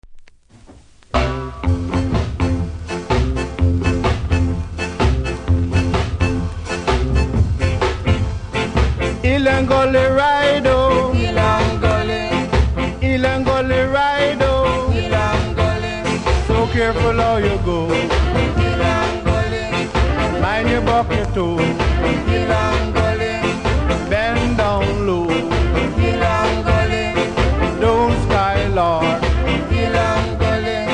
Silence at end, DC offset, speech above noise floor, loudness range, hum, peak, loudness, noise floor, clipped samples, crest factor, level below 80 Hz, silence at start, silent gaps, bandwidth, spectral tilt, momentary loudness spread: 0 s; under 0.1%; 28 dB; 4 LU; none; -2 dBFS; -17 LUFS; -44 dBFS; under 0.1%; 14 dB; -24 dBFS; 0.05 s; none; 10.5 kHz; -6.5 dB/octave; 5 LU